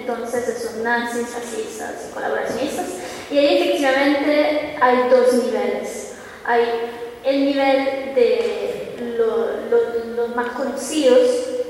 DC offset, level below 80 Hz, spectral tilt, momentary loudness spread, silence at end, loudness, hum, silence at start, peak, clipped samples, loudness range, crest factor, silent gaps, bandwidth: under 0.1%; -58 dBFS; -3.5 dB/octave; 13 LU; 0 s; -20 LUFS; none; 0 s; -4 dBFS; under 0.1%; 4 LU; 16 dB; none; 16 kHz